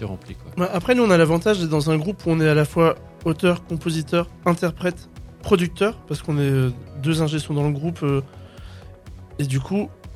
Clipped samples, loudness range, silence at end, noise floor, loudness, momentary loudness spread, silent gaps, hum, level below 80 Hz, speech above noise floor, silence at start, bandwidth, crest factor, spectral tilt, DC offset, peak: under 0.1%; 5 LU; 0 s; -40 dBFS; -21 LUFS; 15 LU; none; none; -44 dBFS; 20 dB; 0 s; 14 kHz; 20 dB; -6.5 dB/octave; under 0.1%; -2 dBFS